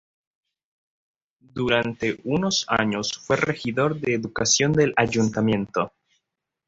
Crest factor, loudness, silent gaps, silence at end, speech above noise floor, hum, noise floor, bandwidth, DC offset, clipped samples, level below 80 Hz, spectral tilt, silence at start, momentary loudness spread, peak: 20 dB; -23 LUFS; none; 0.8 s; 58 dB; none; -81 dBFS; 7.8 kHz; under 0.1%; under 0.1%; -54 dBFS; -4 dB/octave; 1.55 s; 8 LU; -4 dBFS